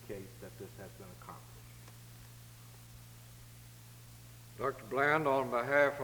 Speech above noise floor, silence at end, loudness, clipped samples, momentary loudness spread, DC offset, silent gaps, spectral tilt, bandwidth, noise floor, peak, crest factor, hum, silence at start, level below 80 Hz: 19 dB; 0 s; -33 LUFS; under 0.1%; 24 LU; under 0.1%; none; -5.5 dB/octave; over 20 kHz; -54 dBFS; -14 dBFS; 22 dB; none; 0 s; -64 dBFS